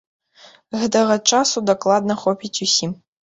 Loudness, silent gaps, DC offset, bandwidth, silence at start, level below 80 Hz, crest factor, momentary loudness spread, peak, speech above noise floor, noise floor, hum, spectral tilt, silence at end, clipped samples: -18 LUFS; none; under 0.1%; 8.2 kHz; 0.7 s; -62 dBFS; 18 dB; 8 LU; -2 dBFS; 31 dB; -49 dBFS; none; -3 dB/octave; 0.3 s; under 0.1%